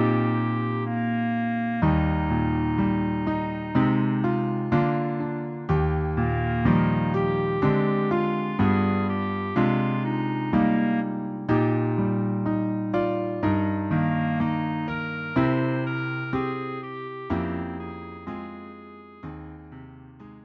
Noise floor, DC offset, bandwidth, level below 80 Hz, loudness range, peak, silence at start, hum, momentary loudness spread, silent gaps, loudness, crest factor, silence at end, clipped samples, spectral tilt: -45 dBFS; under 0.1%; 5.6 kHz; -42 dBFS; 7 LU; -8 dBFS; 0 s; none; 13 LU; none; -25 LUFS; 18 dB; 0 s; under 0.1%; -10 dB/octave